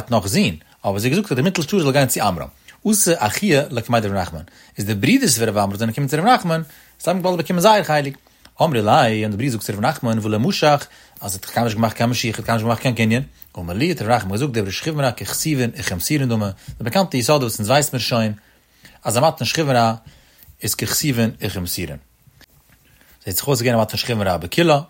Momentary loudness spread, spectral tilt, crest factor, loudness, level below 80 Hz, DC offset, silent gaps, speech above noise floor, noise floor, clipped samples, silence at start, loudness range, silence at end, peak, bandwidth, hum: 11 LU; -4.5 dB/octave; 18 dB; -19 LUFS; -48 dBFS; under 0.1%; none; 35 dB; -53 dBFS; under 0.1%; 0 s; 3 LU; 0.05 s; -2 dBFS; 16.5 kHz; none